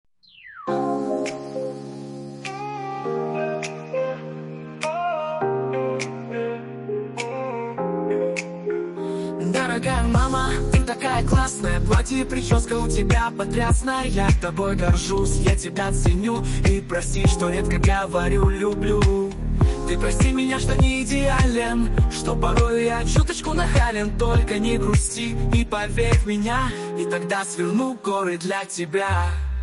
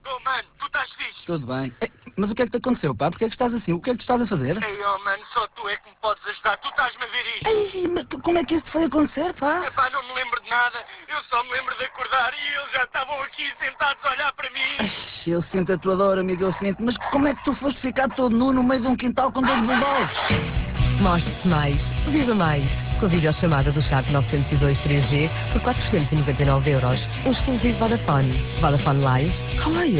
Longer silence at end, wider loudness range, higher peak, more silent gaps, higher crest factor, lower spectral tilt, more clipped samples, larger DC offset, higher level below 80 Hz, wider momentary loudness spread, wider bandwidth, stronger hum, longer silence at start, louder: about the same, 0 s vs 0 s; about the same, 6 LU vs 4 LU; about the same, -6 dBFS vs -8 dBFS; neither; about the same, 14 dB vs 14 dB; second, -5.5 dB/octave vs -10.5 dB/octave; neither; neither; first, -26 dBFS vs -34 dBFS; about the same, 9 LU vs 7 LU; first, 11.5 kHz vs 4 kHz; neither; first, 0.45 s vs 0.05 s; about the same, -23 LUFS vs -23 LUFS